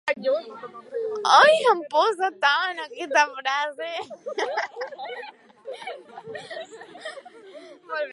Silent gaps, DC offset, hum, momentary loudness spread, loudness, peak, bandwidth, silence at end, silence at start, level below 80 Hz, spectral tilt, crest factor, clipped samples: none; under 0.1%; none; 22 LU; -22 LUFS; -2 dBFS; 11.5 kHz; 0 s; 0.05 s; -82 dBFS; -1.5 dB/octave; 22 dB; under 0.1%